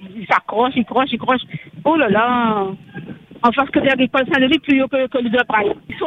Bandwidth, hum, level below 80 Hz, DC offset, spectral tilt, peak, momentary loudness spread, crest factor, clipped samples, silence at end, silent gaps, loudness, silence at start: 7.2 kHz; none; -52 dBFS; under 0.1%; -7 dB/octave; 0 dBFS; 9 LU; 18 dB; under 0.1%; 0 s; none; -17 LUFS; 0 s